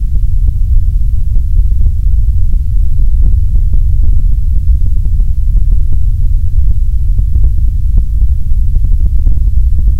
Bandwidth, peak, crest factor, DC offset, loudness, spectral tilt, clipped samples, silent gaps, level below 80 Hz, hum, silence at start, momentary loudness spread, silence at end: 0.7 kHz; 0 dBFS; 6 dB; under 0.1%; -14 LUFS; -9.5 dB/octave; 2%; none; -8 dBFS; none; 0 s; 2 LU; 0 s